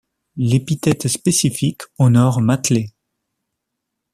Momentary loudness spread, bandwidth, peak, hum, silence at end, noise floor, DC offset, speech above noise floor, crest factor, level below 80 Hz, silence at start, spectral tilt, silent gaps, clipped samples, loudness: 9 LU; 14.5 kHz; -2 dBFS; none; 1.25 s; -78 dBFS; under 0.1%; 62 dB; 16 dB; -52 dBFS; 0.35 s; -5.5 dB/octave; none; under 0.1%; -17 LUFS